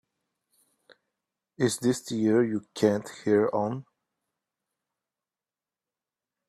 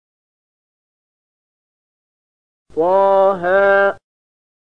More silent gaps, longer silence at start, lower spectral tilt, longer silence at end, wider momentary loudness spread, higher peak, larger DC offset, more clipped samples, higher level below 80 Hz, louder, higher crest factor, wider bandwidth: neither; second, 1.6 s vs 2.75 s; second, -5.5 dB/octave vs -7 dB/octave; first, 2.65 s vs 0.8 s; second, 7 LU vs 12 LU; second, -8 dBFS vs -4 dBFS; second, under 0.1% vs 0.7%; neither; second, -72 dBFS vs -58 dBFS; second, -27 LUFS vs -14 LUFS; first, 22 dB vs 16 dB; first, 14.5 kHz vs 5.2 kHz